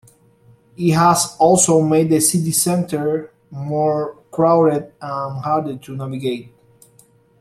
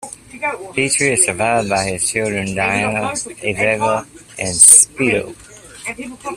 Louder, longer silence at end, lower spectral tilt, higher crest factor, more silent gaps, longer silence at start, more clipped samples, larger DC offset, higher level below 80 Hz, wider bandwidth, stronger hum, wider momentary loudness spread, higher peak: second, -17 LUFS vs -14 LUFS; first, 1 s vs 0 s; first, -5 dB/octave vs -2 dB/octave; about the same, 16 dB vs 18 dB; neither; first, 0.8 s vs 0 s; second, under 0.1% vs 0.2%; neither; second, -56 dBFS vs -50 dBFS; about the same, 15.5 kHz vs 16 kHz; neither; second, 14 LU vs 20 LU; about the same, -2 dBFS vs 0 dBFS